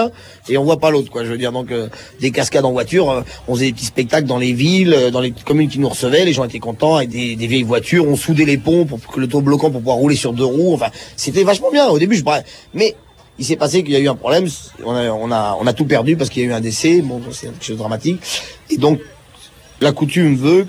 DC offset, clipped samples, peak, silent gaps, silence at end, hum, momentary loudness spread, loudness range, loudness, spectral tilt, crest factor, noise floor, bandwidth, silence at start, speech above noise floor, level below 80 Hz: under 0.1%; under 0.1%; -2 dBFS; none; 0 s; none; 9 LU; 3 LU; -16 LUFS; -5.5 dB/octave; 14 dB; -42 dBFS; over 20 kHz; 0 s; 27 dB; -48 dBFS